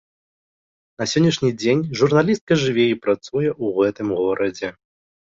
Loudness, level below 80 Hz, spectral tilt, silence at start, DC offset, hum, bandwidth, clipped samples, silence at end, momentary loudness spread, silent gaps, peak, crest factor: -20 LUFS; -56 dBFS; -5.5 dB/octave; 1 s; under 0.1%; none; 7.8 kHz; under 0.1%; 0.6 s; 6 LU; 2.41-2.47 s; -4 dBFS; 18 dB